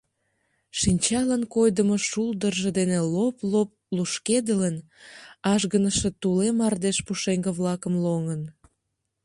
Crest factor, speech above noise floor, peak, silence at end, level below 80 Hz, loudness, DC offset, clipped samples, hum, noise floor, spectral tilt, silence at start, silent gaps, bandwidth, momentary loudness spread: 16 dB; 55 dB; -8 dBFS; 0.75 s; -50 dBFS; -24 LUFS; under 0.1%; under 0.1%; none; -79 dBFS; -5 dB/octave; 0.75 s; none; 11.5 kHz; 7 LU